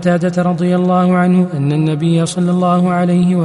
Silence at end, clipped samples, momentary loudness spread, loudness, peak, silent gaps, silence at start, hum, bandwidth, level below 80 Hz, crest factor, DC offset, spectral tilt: 0 s; under 0.1%; 3 LU; -14 LUFS; -2 dBFS; none; 0 s; none; 11.5 kHz; -52 dBFS; 10 dB; under 0.1%; -7.5 dB/octave